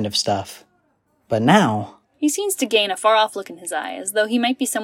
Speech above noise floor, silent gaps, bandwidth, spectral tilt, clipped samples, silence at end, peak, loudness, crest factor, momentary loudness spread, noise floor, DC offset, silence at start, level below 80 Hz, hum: 45 dB; none; 16.5 kHz; -3.5 dB/octave; under 0.1%; 0 s; -2 dBFS; -20 LUFS; 18 dB; 12 LU; -65 dBFS; under 0.1%; 0 s; -66 dBFS; none